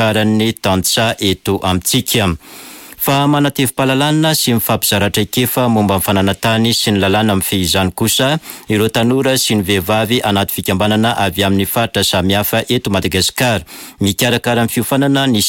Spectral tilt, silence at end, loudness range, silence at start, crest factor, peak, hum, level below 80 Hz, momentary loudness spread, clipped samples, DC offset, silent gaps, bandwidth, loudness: -4 dB/octave; 0 s; 1 LU; 0 s; 12 dB; -2 dBFS; none; -42 dBFS; 4 LU; under 0.1%; under 0.1%; none; 17 kHz; -14 LUFS